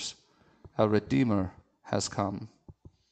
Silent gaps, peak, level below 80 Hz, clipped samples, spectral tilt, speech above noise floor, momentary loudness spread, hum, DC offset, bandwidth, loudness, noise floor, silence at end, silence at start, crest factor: none; -10 dBFS; -60 dBFS; under 0.1%; -5.5 dB/octave; 35 dB; 15 LU; none; under 0.1%; 9.4 kHz; -30 LUFS; -63 dBFS; 0.4 s; 0 s; 22 dB